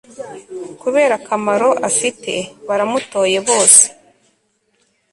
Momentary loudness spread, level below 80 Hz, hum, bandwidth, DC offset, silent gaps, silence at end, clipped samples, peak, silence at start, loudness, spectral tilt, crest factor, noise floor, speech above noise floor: 23 LU; -62 dBFS; none; 16 kHz; under 0.1%; none; 1.2 s; 0.1%; 0 dBFS; 0.2 s; -14 LUFS; -1.5 dB/octave; 16 dB; -63 dBFS; 47 dB